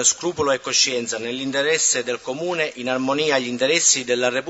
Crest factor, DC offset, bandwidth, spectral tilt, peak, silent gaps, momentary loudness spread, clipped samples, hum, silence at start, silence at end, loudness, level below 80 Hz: 18 dB; under 0.1%; 8.2 kHz; -1 dB/octave; -4 dBFS; none; 9 LU; under 0.1%; none; 0 s; 0 s; -20 LUFS; -62 dBFS